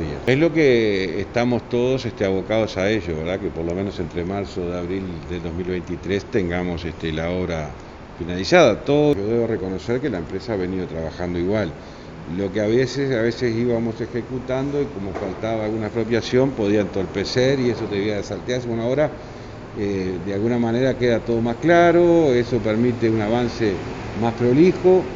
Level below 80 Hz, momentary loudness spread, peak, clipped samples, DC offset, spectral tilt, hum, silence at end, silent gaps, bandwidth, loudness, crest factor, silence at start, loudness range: -42 dBFS; 12 LU; 0 dBFS; under 0.1%; under 0.1%; -6.5 dB/octave; none; 0 s; none; 7.6 kHz; -21 LUFS; 20 dB; 0 s; 7 LU